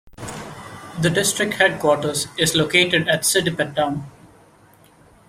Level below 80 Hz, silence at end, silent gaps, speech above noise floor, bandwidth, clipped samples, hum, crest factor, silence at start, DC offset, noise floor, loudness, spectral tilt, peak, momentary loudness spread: -52 dBFS; 1.05 s; none; 32 dB; 16 kHz; under 0.1%; none; 20 dB; 0.05 s; under 0.1%; -51 dBFS; -18 LUFS; -3 dB/octave; -2 dBFS; 18 LU